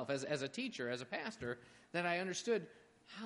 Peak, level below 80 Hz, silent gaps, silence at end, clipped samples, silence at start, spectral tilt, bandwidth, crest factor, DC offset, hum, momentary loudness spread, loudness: -24 dBFS; -78 dBFS; none; 0 s; under 0.1%; 0 s; -4 dB/octave; 11.5 kHz; 18 dB; under 0.1%; none; 9 LU; -41 LUFS